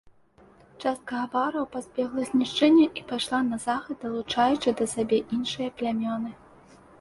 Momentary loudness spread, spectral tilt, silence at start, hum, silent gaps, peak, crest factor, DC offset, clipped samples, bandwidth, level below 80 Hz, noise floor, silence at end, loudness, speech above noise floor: 11 LU; -4 dB/octave; 0.8 s; none; none; -8 dBFS; 18 dB; under 0.1%; under 0.1%; 11.5 kHz; -62 dBFS; -57 dBFS; 0.65 s; -26 LUFS; 31 dB